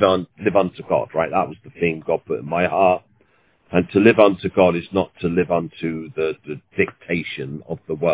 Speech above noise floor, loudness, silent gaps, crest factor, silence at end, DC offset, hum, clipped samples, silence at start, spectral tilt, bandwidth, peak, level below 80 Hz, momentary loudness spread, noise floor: 40 dB; -20 LUFS; none; 20 dB; 0 s; under 0.1%; none; under 0.1%; 0 s; -10.5 dB/octave; 4 kHz; 0 dBFS; -48 dBFS; 13 LU; -60 dBFS